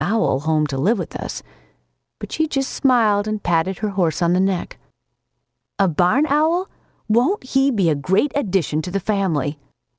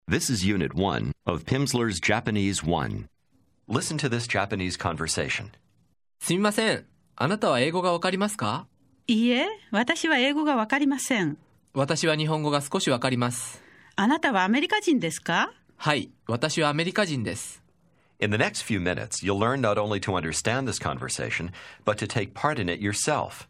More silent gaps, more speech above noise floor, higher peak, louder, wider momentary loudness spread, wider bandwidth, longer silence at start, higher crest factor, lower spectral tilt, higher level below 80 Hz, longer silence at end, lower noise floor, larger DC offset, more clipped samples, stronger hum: neither; first, 55 dB vs 42 dB; about the same, -4 dBFS vs -4 dBFS; first, -20 LUFS vs -26 LUFS; about the same, 10 LU vs 8 LU; second, 8 kHz vs 15.5 kHz; about the same, 0 s vs 0.1 s; second, 16 dB vs 22 dB; first, -6 dB/octave vs -4.5 dB/octave; about the same, -50 dBFS vs -54 dBFS; first, 0.45 s vs 0.05 s; first, -75 dBFS vs -67 dBFS; neither; neither; neither